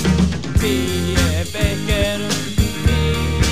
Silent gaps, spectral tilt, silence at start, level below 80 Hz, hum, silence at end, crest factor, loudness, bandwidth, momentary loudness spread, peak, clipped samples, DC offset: none; -5 dB/octave; 0 s; -24 dBFS; none; 0 s; 16 dB; -19 LUFS; 15.5 kHz; 3 LU; -2 dBFS; under 0.1%; 2%